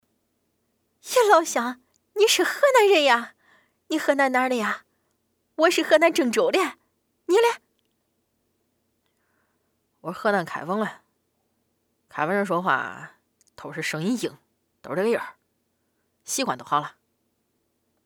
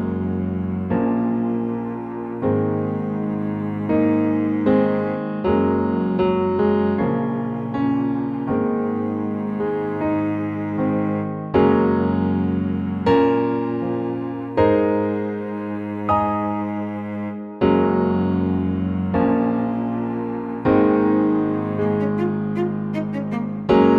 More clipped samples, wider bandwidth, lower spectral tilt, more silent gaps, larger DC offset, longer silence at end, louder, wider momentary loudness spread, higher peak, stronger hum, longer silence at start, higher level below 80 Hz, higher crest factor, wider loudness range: neither; first, 19.5 kHz vs 5.4 kHz; second, -3 dB/octave vs -10 dB/octave; neither; neither; first, 1.15 s vs 0 s; about the same, -22 LUFS vs -21 LUFS; first, 19 LU vs 8 LU; about the same, -4 dBFS vs -4 dBFS; neither; first, 1.05 s vs 0 s; second, -78 dBFS vs -48 dBFS; first, 22 dB vs 16 dB; first, 10 LU vs 3 LU